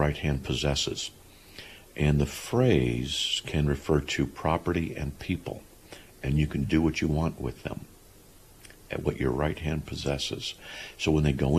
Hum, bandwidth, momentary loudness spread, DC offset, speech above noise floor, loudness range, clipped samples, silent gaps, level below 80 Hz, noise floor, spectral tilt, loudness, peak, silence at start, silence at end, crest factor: none; 14.5 kHz; 15 LU; under 0.1%; 26 dB; 5 LU; under 0.1%; none; -40 dBFS; -53 dBFS; -5.5 dB/octave; -28 LUFS; -10 dBFS; 0 s; 0 s; 18 dB